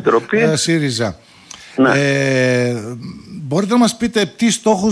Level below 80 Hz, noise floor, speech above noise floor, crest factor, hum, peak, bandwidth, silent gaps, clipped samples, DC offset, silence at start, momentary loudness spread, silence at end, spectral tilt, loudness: -52 dBFS; -39 dBFS; 24 dB; 14 dB; none; -2 dBFS; 11 kHz; none; under 0.1%; under 0.1%; 0 s; 15 LU; 0 s; -4.5 dB/octave; -15 LUFS